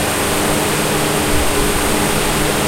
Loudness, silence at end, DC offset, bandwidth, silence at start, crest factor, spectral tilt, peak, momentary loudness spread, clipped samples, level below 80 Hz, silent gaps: -15 LUFS; 0 s; under 0.1%; 16 kHz; 0 s; 12 dB; -3 dB/octave; -2 dBFS; 0 LU; under 0.1%; -26 dBFS; none